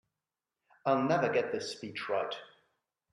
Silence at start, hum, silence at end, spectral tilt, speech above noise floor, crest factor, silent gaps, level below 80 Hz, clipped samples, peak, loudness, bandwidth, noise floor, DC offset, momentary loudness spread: 0.85 s; none; 0.65 s; -5 dB/octave; over 58 dB; 20 dB; none; -76 dBFS; under 0.1%; -16 dBFS; -33 LUFS; 12 kHz; under -90 dBFS; under 0.1%; 11 LU